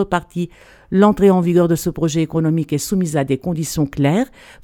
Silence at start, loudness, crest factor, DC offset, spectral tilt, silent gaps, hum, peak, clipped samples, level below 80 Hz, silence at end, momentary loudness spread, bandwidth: 0 s; -17 LUFS; 16 dB; under 0.1%; -6.5 dB/octave; none; none; 0 dBFS; under 0.1%; -42 dBFS; 0.35 s; 9 LU; 18 kHz